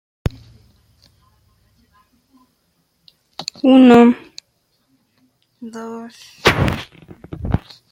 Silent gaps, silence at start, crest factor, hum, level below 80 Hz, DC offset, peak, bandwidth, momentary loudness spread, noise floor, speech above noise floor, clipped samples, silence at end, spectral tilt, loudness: none; 0.25 s; 18 dB; none; -38 dBFS; under 0.1%; 0 dBFS; 15.5 kHz; 28 LU; -65 dBFS; 52 dB; under 0.1%; 0.35 s; -6.5 dB/octave; -14 LUFS